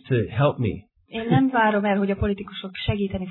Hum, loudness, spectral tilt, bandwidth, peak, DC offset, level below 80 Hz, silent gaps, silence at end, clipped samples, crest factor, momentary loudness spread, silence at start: none; -23 LUFS; -11 dB/octave; 4.2 kHz; -6 dBFS; under 0.1%; -42 dBFS; none; 0 s; under 0.1%; 16 dB; 12 LU; 0.05 s